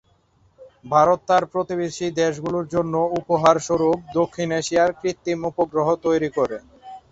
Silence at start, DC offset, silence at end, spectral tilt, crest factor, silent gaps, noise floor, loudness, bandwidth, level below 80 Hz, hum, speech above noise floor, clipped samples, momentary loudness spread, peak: 0.6 s; under 0.1%; 0.1 s; -5.5 dB/octave; 20 dB; none; -60 dBFS; -21 LUFS; 8 kHz; -56 dBFS; none; 39 dB; under 0.1%; 8 LU; -2 dBFS